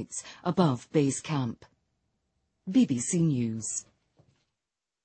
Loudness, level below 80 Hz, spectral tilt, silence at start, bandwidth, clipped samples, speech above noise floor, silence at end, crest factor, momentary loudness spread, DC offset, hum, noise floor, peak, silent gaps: -28 LUFS; -66 dBFS; -5.5 dB/octave; 0 s; 8.8 kHz; under 0.1%; 60 dB; 1.2 s; 20 dB; 11 LU; under 0.1%; none; -88 dBFS; -10 dBFS; none